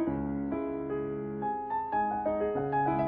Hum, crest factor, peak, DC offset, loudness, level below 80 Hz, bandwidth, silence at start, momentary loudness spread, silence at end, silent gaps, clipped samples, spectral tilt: none; 12 dB; -18 dBFS; under 0.1%; -32 LUFS; -54 dBFS; 4.7 kHz; 0 s; 5 LU; 0 s; none; under 0.1%; -11.5 dB/octave